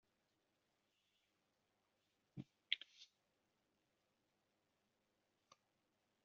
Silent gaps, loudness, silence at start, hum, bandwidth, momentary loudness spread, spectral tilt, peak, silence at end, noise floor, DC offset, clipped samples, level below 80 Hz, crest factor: none; -48 LUFS; 2.35 s; none; 7 kHz; 20 LU; -0.5 dB/octave; -20 dBFS; 3.2 s; -86 dBFS; under 0.1%; under 0.1%; under -90 dBFS; 40 dB